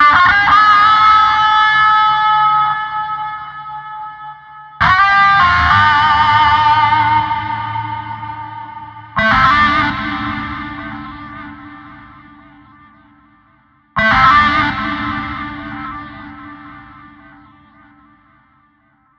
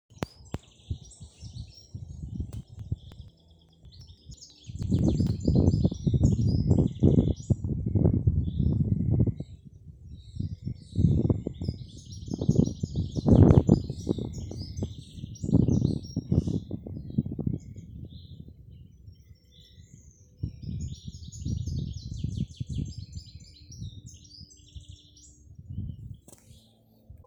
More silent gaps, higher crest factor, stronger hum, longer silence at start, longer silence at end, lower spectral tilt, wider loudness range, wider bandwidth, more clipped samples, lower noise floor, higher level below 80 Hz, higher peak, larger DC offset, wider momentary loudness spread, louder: neither; second, 14 dB vs 26 dB; neither; second, 0 s vs 0.2 s; first, 2.35 s vs 0.15 s; second, -4.5 dB/octave vs -8.5 dB/octave; about the same, 17 LU vs 18 LU; second, 7.4 kHz vs 8.8 kHz; neither; second, -55 dBFS vs -60 dBFS; about the same, -38 dBFS vs -40 dBFS; first, 0 dBFS vs -4 dBFS; neither; second, 21 LU vs 24 LU; first, -11 LUFS vs -28 LUFS